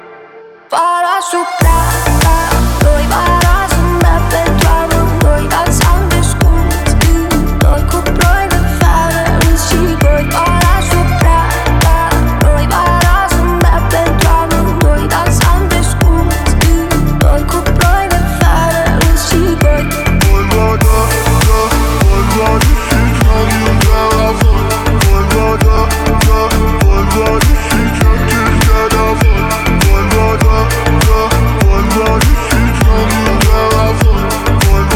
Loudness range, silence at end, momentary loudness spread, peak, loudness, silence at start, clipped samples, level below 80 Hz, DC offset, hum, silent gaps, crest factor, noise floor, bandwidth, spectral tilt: 1 LU; 0 s; 2 LU; 0 dBFS; -11 LUFS; 0.05 s; under 0.1%; -12 dBFS; under 0.1%; none; none; 8 dB; -35 dBFS; 18.5 kHz; -5 dB/octave